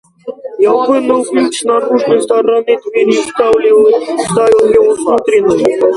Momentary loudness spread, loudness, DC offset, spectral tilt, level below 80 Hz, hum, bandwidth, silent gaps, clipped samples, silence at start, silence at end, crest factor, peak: 6 LU; -10 LUFS; under 0.1%; -4.5 dB/octave; -50 dBFS; none; 11.5 kHz; none; under 0.1%; 0.25 s; 0 s; 10 dB; 0 dBFS